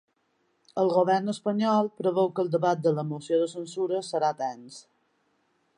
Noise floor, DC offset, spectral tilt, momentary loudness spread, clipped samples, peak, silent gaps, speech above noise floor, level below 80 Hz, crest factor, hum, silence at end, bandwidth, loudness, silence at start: -72 dBFS; under 0.1%; -6.5 dB/octave; 9 LU; under 0.1%; -10 dBFS; none; 46 dB; -80 dBFS; 18 dB; none; 1 s; 11 kHz; -27 LUFS; 0.75 s